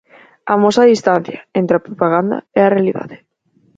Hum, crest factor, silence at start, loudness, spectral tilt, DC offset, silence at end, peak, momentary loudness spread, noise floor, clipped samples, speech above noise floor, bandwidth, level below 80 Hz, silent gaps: none; 16 dB; 0.45 s; -14 LUFS; -6.5 dB/octave; under 0.1%; 0.6 s; 0 dBFS; 11 LU; -57 dBFS; under 0.1%; 43 dB; 8.6 kHz; -58 dBFS; none